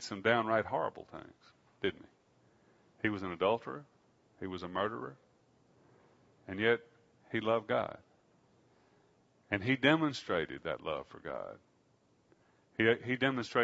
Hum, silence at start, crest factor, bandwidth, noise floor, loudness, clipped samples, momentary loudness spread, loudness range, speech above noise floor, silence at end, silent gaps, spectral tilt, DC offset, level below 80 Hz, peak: none; 0 s; 24 dB; 7.6 kHz; -71 dBFS; -34 LUFS; under 0.1%; 17 LU; 4 LU; 37 dB; 0 s; none; -3.5 dB/octave; under 0.1%; -70 dBFS; -12 dBFS